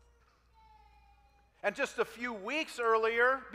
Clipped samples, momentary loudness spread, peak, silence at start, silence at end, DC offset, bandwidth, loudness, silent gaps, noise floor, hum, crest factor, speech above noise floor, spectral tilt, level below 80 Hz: under 0.1%; 9 LU; -16 dBFS; 1.65 s; 0 s; under 0.1%; 15.5 kHz; -32 LUFS; none; -66 dBFS; none; 20 dB; 34 dB; -3 dB/octave; -68 dBFS